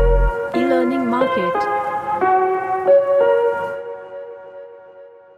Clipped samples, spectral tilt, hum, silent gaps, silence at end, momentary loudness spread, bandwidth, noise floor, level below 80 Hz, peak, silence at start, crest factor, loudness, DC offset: under 0.1%; -7.5 dB/octave; none; none; 0.3 s; 19 LU; 9.8 kHz; -42 dBFS; -28 dBFS; -4 dBFS; 0 s; 14 dB; -18 LUFS; under 0.1%